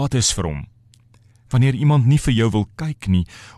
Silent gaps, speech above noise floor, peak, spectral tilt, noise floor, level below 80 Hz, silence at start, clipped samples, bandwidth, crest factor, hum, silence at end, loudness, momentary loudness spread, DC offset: none; 34 dB; -6 dBFS; -5.5 dB/octave; -52 dBFS; -36 dBFS; 0 s; under 0.1%; 13 kHz; 14 dB; none; 0.1 s; -19 LUFS; 11 LU; under 0.1%